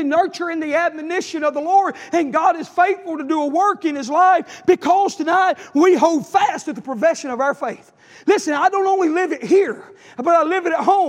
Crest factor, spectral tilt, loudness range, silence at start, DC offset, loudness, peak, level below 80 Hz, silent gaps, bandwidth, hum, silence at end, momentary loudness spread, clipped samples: 16 dB; -4 dB/octave; 3 LU; 0 s; under 0.1%; -18 LUFS; -2 dBFS; -72 dBFS; none; 12 kHz; none; 0 s; 9 LU; under 0.1%